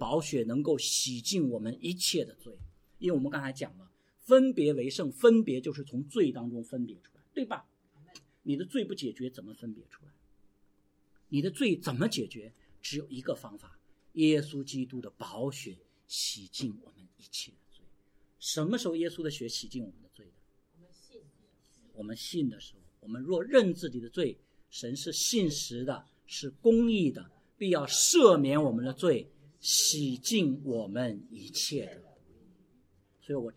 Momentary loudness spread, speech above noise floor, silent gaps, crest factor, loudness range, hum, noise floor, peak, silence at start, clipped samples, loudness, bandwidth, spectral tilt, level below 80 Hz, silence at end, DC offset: 18 LU; 38 dB; none; 26 dB; 13 LU; none; -68 dBFS; -6 dBFS; 0 s; under 0.1%; -30 LUFS; 16.5 kHz; -4 dB/octave; -64 dBFS; 0.05 s; under 0.1%